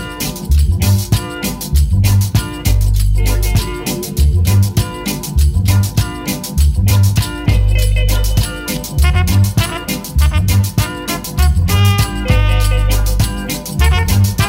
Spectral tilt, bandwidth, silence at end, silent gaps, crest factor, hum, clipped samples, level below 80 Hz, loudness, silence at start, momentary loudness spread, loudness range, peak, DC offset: -5 dB/octave; 16.5 kHz; 0 s; none; 12 dB; none; under 0.1%; -16 dBFS; -15 LUFS; 0 s; 7 LU; 1 LU; 0 dBFS; under 0.1%